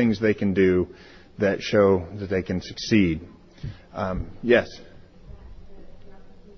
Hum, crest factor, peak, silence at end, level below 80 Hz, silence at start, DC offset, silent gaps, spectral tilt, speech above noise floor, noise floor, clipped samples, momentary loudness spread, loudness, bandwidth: none; 20 dB; -4 dBFS; 0.25 s; -44 dBFS; 0 s; under 0.1%; none; -6.5 dB/octave; 21 dB; -44 dBFS; under 0.1%; 18 LU; -23 LUFS; 6.6 kHz